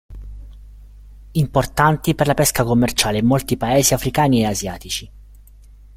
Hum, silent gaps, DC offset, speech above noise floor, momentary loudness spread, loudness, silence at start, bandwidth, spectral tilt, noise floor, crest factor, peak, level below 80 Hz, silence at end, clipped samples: 50 Hz at -40 dBFS; none; under 0.1%; 26 dB; 11 LU; -18 LUFS; 0.1 s; 16.5 kHz; -4.5 dB/octave; -43 dBFS; 18 dB; 0 dBFS; -36 dBFS; 0.75 s; under 0.1%